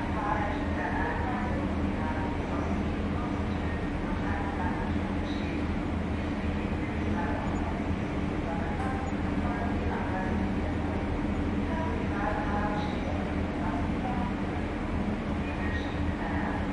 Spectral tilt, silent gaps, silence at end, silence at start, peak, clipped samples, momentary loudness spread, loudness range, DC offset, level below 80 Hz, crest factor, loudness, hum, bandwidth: -7.5 dB/octave; none; 0 s; 0 s; -16 dBFS; under 0.1%; 2 LU; 1 LU; under 0.1%; -38 dBFS; 14 dB; -31 LUFS; none; 10.5 kHz